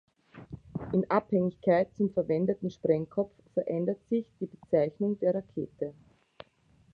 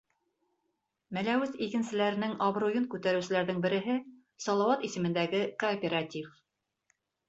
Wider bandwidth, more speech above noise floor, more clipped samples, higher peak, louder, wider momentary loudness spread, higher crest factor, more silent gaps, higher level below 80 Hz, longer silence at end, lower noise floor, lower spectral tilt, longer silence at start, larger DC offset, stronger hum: second, 6.4 kHz vs 8 kHz; second, 35 dB vs 51 dB; neither; first, -10 dBFS vs -14 dBFS; about the same, -30 LUFS vs -31 LUFS; first, 13 LU vs 6 LU; about the same, 20 dB vs 18 dB; neither; first, -64 dBFS vs -74 dBFS; about the same, 1 s vs 1 s; second, -64 dBFS vs -82 dBFS; first, -10 dB/octave vs -5.5 dB/octave; second, 0.35 s vs 1.1 s; neither; neither